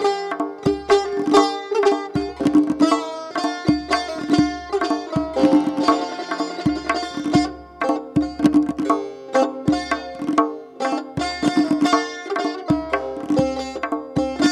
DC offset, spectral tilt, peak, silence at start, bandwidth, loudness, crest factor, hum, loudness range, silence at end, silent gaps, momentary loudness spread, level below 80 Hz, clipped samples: under 0.1%; -5.5 dB/octave; -2 dBFS; 0 s; 11 kHz; -21 LUFS; 18 dB; none; 2 LU; 0 s; none; 8 LU; -48 dBFS; under 0.1%